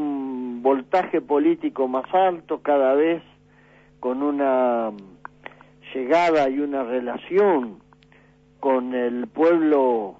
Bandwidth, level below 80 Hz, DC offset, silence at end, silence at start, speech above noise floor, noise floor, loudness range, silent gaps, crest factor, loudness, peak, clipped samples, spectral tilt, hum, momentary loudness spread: 7.8 kHz; -64 dBFS; under 0.1%; 0.1 s; 0 s; 33 dB; -54 dBFS; 2 LU; none; 14 dB; -22 LUFS; -8 dBFS; under 0.1%; -6.5 dB/octave; none; 11 LU